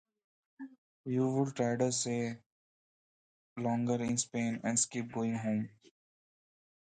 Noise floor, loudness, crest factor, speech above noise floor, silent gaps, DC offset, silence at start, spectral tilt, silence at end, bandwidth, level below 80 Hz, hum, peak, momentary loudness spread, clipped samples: under -90 dBFS; -34 LUFS; 20 dB; over 57 dB; 0.78-1.04 s, 2.46-3.56 s; under 0.1%; 0.6 s; -4.5 dB/octave; 1.25 s; 9.4 kHz; -74 dBFS; none; -16 dBFS; 19 LU; under 0.1%